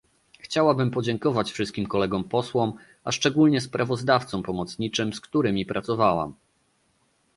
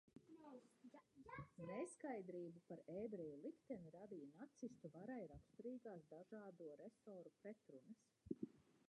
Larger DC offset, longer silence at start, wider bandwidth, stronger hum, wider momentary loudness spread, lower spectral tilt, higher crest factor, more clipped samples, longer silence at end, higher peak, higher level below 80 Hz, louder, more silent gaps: neither; first, 0.45 s vs 0.05 s; first, 11.5 kHz vs 10 kHz; neither; second, 8 LU vs 13 LU; second, -5.5 dB/octave vs -7 dB/octave; about the same, 20 dB vs 24 dB; neither; first, 1.05 s vs 0.05 s; first, -6 dBFS vs -34 dBFS; first, -56 dBFS vs -82 dBFS; first, -25 LUFS vs -57 LUFS; neither